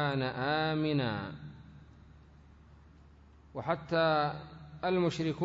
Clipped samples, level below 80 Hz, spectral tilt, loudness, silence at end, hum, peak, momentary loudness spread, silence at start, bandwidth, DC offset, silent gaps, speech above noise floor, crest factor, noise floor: under 0.1%; -60 dBFS; -7 dB/octave; -32 LUFS; 0 s; none; -16 dBFS; 18 LU; 0 s; 7.8 kHz; under 0.1%; none; 26 dB; 18 dB; -57 dBFS